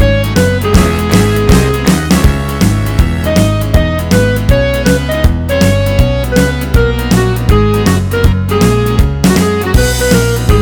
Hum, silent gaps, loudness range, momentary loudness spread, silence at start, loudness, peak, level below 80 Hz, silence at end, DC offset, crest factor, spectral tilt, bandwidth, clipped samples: none; none; 1 LU; 2 LU; 0 s; -11 LUFS; 0 dBFS; -16 dBFS; 0 s; 0.4%; 10 dB; -6 dB/octave; over 20 kHz; 0.9%